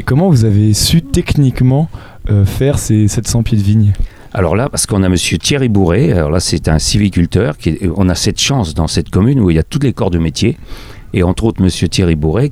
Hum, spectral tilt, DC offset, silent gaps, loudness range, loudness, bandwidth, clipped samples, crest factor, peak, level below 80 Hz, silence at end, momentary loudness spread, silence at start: none; -5.5 dB/octave; under 0.1%; none; 2 LU; -12 LUFS; 15.5 kHz; under 0.1%; 12 dB; 0 dBFS; -26 dBFS; 0 s; 5 LU; 0 s